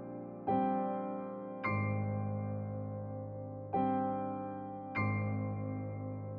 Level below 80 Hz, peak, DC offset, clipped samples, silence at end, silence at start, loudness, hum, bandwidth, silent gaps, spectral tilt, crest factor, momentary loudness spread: -68 dBFS; -20 dBFS; under 0.1%; under 0.1%; 0 s; 0 s; -37 LUFS; none; 4.5 kHz; none; -8.5 dB/octave; 16 dB; 9 LU